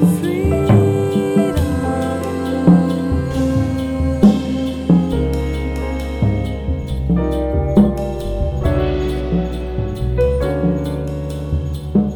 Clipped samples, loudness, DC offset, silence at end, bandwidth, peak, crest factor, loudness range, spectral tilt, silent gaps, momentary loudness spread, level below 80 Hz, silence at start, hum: under 0.1%; -18 LUFS; under 0.1%; 0 s; 16.5 kHz; 0 dBFS; 16 dB; 3 LU; -8 dB/octave; none; 9 LU; -24 dBFS; 0 s; none